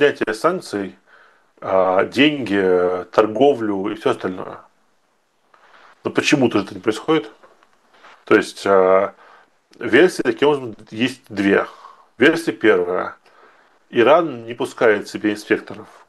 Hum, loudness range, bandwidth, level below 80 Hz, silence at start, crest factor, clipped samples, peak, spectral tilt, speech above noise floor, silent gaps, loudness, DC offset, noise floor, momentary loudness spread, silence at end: none; 4 LU; 12.5 kHz; -64 dBFS; 0 s; 18 dB; under 0.1%; 0 dBFS; -5 dB/octave; 47 dB; none; -18 LUFS; under 0.1%; -64 dBFS; 13 LU; 0.25 s